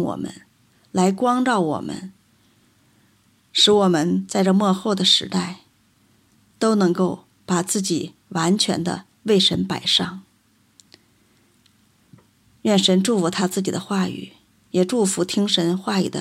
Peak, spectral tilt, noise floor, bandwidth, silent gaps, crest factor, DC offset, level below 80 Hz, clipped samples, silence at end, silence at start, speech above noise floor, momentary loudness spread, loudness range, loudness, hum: -4 dBFS; -4.5 dB/octave; -60 dBFS; 15 kHz; none; 18 dB; under 0.1%; -62 dBFS; under 0.1%; 0 s; 0 s; 41 dB; 13 LU; 5 LU; -20 LUFS; none